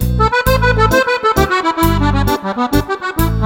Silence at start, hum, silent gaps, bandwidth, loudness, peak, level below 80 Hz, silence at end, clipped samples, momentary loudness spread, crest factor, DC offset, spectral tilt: 0 s; none; none; 17.5 kHz; -14 LUFS; 0 dBFS; -22 dBFS; 0 s; under 0.1%; 5 LU; 14 dB; under 0.1%; -5.5 dB/octave